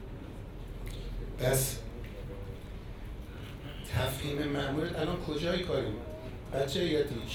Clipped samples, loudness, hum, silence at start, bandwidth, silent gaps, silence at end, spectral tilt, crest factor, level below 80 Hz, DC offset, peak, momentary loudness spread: under 0.1%; -35 LUFS; none; 0 s; over 20 kHz; none; 0 s; -5 dB/octave; 18 dB; -44 dBFS; under 0.1%; -16 dBFS; 15 LU